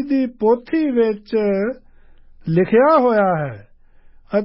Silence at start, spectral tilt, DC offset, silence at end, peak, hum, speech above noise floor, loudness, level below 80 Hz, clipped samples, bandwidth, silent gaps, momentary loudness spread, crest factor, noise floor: 0 s; -12.5 dB/octave; under 0.1%; 0 s; -4 dBFS; none; 29 dB; -17 LUFS; -52 dBFS; under 0.1%; 5.8 kHz; none; 12 LU; 14 dB; -46 dBFS